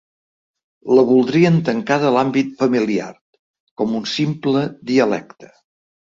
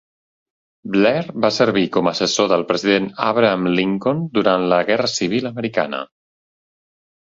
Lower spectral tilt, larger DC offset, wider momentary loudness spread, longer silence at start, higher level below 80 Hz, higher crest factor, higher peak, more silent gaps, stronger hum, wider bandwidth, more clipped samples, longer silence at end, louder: first, -6.5 dB/octave vs -4.5 dB/octave; neither; first, 10 LU vs 6 LU; about the same, 0.85 s vs 0.85 s; about the same, -60 dBFS vs -60 dBFS; about the same, 16 dB vs 18 dB; about the same, -2 dBFS vs -2 dBFS; first, 3.21-3.33 s, 3.39-3.54 s, 3.60-3.76 s vs none; neither; about the same, 7.6 kHz vs 7.8 kHz; neither; second, 0.7 s vs 1.15 s; about the same, -17 LUFS vs -18 LUFS